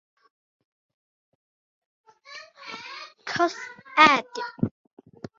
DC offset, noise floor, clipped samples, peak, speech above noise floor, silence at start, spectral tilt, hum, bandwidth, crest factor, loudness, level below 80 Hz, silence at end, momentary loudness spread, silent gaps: under 0.1%; -46 dBFS; under 0.1%; -2 dBFS; 24 dB; 2.3 s; -4 dB/octave; none; 7.6 kHz; 26 dB; -22 LUFS; -64 dBFS; 0.7 s; 26 LU; none